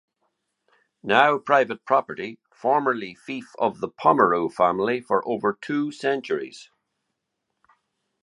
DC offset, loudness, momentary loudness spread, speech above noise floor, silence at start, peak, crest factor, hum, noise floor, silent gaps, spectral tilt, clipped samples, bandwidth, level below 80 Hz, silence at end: under 0.1%; -23 LUFS; 16 LU; 57 dB; 1.05 s; -2 dBFS; 24 dB; none; -79 dBFS; none; -5.5 dB/octave; under 0.1%; 11 kHz; -68 dBFS; 1.6 s